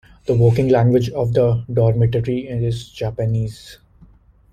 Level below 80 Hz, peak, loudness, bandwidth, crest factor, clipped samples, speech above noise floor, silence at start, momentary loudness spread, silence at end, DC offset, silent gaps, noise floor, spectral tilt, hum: -42 dBFS; -2 dBFS; -18 LUFS; 9 kHz; 16 dB; under 0.1%; 32 dB; 0.25 s; 10 LU; 0.8 s; under 0.1%; none; -49 dBFS; -8.5 dB/octave; none